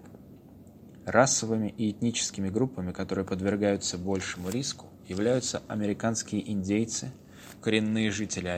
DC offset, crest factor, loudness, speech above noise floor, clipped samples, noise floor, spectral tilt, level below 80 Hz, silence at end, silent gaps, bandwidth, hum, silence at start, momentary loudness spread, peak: under 0.1%; 24 dB; -29 LUFS; 22 dB; under 0.1%; -51 dBFS; -4 dB/octave; -60 dBFS; 0 s; none; 16 kHz; none; 0 s; 9 LU; -6 dBFS